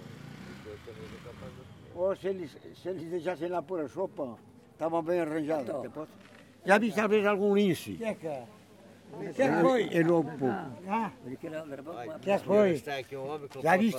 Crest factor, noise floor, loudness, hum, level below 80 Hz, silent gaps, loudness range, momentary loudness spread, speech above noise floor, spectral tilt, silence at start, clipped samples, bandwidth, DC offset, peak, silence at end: 22 dB; -54 dBFS; -30 LUFS; none; -68 dBFS; none; 7 LU; 20 LU; 24 dB; -6.5 dB/octave; 0 s; under 0.1%; 17 kHz; under 0.1%; -8 dBFS; 0 s